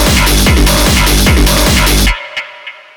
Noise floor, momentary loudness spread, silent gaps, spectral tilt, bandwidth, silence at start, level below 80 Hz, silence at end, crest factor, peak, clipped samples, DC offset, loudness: -31 dBFS; 13 LU; none; -3.5 dB/octave; over 20 kHz; 0 s; -12 dBFS; 0.25 s; 8 dB; 0 dBFS; under 0.1%; under 0.1%; -9 LUFS